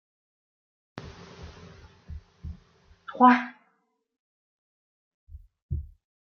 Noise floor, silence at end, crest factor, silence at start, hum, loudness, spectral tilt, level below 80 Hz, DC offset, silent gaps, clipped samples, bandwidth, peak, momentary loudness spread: -72 dBFS; 0.55 s; 28 dB; 0.95 s; none; -23 LUFS; -7.5 dB/octave; -50 dBFS; under 0.1%; 4.19-5.27 s, 5.62-5.69 s; under 0.1%; 6.6 kHz; -4 dBFS; 28 LU